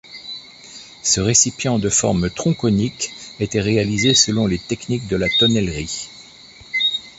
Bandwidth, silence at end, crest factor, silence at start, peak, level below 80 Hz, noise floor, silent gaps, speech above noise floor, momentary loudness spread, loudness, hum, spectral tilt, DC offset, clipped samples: 8.4 kHz; 0.1 s; 18 dB; 0.05 s; -2 dBFS; -42 dBFS; -43 dBFS; none; 25 dB; 18 LU; -18 LUFS; none; -3.5 dB/octave; under 0.1%; under 0.1%